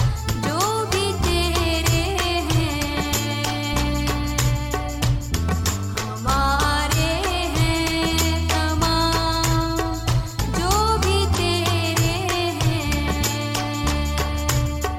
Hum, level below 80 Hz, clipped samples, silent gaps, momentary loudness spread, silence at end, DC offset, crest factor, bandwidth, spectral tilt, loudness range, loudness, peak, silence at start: none; -28 dBFS; under 0.1%; none; 4 LU; 0 s; under 0.1%; 14 dB; 17 kHz; -4.5 dB/octave; 2 LU; -21 LUFS; -6 dBFS; 0 s